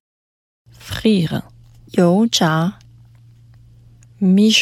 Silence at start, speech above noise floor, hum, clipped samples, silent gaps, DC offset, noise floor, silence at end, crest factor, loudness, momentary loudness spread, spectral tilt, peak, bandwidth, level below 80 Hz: 0.85 s; 32 dB; none; under 0.1%; none; under 0.1%; -46 dBFS; 0 s; 18 dB; -17 LUFS; 10 LU; -5 dB/octave; 0 dBFS; 15 kHz; -50 dBFS